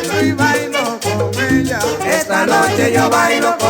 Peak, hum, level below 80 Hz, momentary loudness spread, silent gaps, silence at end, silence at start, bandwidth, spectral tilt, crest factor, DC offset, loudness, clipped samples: 0 dBFS; none; -44 dBFS; 5 LU; none; 0 s; 0 s; 19 kHz; -4 dB/octave; 14 dB; under 0.1%; -14 LUFS; under 0.1%